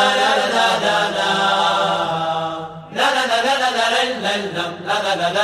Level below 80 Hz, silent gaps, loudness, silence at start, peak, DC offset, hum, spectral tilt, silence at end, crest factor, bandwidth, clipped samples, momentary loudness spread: -60 dBFS; none; -17 LUFS; 0 s; -4 dBFS; under 0.1%; none; -2.5 dB/octave; 0 s; 14 dB; 15.5 kHz; under 0.1%; 8 LU